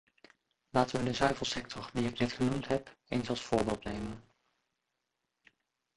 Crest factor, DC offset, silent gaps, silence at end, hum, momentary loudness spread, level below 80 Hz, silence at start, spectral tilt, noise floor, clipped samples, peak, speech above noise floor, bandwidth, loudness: 24 dB; under 0.1%; none; 1.75 s; none; 9 LU; -56 dBFS; 0.75 s; -5 dB/octave; -85 dBFS; under 0.1%; -12 dBFS; 52 dB; 11.5 kHz; -34 LUFS